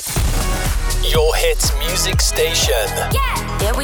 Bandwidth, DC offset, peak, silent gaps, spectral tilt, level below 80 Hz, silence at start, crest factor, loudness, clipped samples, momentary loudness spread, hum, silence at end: over 20 kHz; under 0.1%; -4 dBFS; none; -3 dB/octave; -20 dBFS; 0 s; 12 dB; -17 LUFS; under 0.1%; 5 LU; none; 0 s